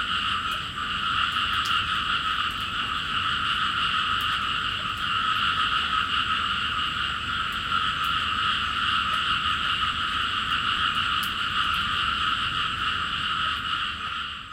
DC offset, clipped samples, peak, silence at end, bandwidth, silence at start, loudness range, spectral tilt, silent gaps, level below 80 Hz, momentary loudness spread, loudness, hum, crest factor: under 0.1%; under 0.1%; -10 dBFS; 0 s; 16.5 kHz; 0 s; 1 LU; -2 dB/octave; none; -46 dBFS; 4 LU; -24 LUFS; none; 16 dB